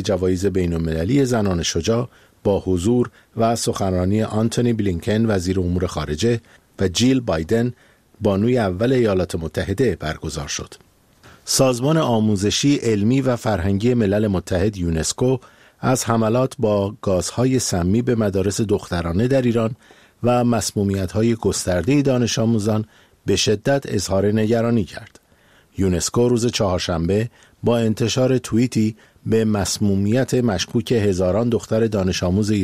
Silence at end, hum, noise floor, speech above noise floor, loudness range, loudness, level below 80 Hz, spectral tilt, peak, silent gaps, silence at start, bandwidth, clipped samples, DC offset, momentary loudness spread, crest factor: 0 s; none; -54 dBFS; 35 dB; 2 LU; -20 LUFS; -42 dBFS; -5.5 dB/octave; -2 dBFS; none; 0 s; 15.5 kHz; under 0.1%; 0.2%; 7 LU; 18 dB